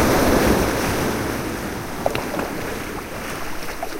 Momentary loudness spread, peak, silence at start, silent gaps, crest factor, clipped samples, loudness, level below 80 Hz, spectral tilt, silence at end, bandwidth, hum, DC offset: 12 LU; -4 dBFS; 0 s; none; 18 dB; under 0.1%; -22 LUFS; -34 dBFS; -4.5 dB/octave; 0 s; 16 kHz; none; under 0.1%